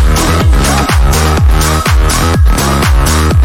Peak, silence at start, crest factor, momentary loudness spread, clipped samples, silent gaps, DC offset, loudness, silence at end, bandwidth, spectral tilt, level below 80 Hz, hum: 0 dBFS; 0 s; 8 dB; 1 LU; under 0.1%; none; under 0.1%; -9 LUFS; 0 s; 17 kHz; -4.5 dB/octave; -10 dBFS; none